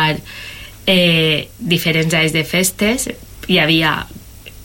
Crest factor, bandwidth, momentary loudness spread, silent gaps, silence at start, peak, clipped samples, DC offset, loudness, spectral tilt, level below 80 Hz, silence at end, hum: 14 dB; 17 kHz; 18 LU; none; 0 s; -2 dBFS; under 0.1%; under 0.1%; -15 LUFS; -4 dB/octave; -40 dBFS; 0 s; none